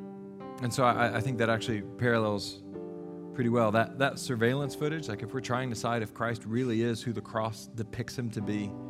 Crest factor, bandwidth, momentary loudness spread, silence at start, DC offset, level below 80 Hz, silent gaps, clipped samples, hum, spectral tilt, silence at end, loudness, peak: 22 dB; 15 kHz; 13 LU; 0 s; under 0.1%; -64 dBFS; none; under 0.1%; none; -6 dB/octave; 0 s; -31 LUFS; -10 dBFS